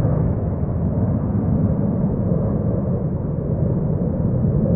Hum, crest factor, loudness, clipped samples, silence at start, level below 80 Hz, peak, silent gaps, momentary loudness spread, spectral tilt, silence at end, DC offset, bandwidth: none; 12 dB; -21 LUFS; under 0.1%; 0 s; -30 dBFS; -6 dBFS; none; 3 LU; -16 dB/octave; 0 s; under 0.1%; 2.4 kHz